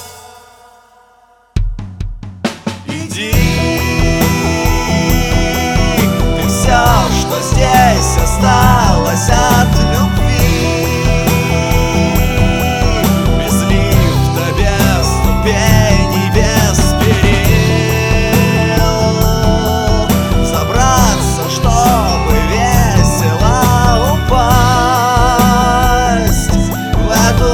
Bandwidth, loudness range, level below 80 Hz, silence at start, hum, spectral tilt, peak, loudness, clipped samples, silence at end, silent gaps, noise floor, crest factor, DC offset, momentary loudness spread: over 20 kHz; 3 LU; -18 dBFS; 0 s; none; -5 dB/octave; 0 dBFS; -12 LUFS; 0.3%; 0 s; none; -48 dBFS; 10 dB; 0.7%; 5 LU